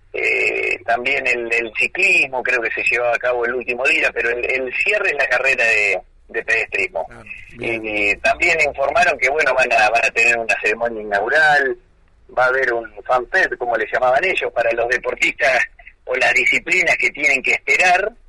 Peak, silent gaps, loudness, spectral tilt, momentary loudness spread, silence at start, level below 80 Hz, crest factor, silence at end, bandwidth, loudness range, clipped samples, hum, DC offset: -6 dBFS; none; -16 LUFS; -2.5 dB/octave; 8 LU; 0.15 s; -48 dBFS; 12 dB; 0.15 s; 11.5 kHz; 3 LU; under 0.1%; none; under 0.1%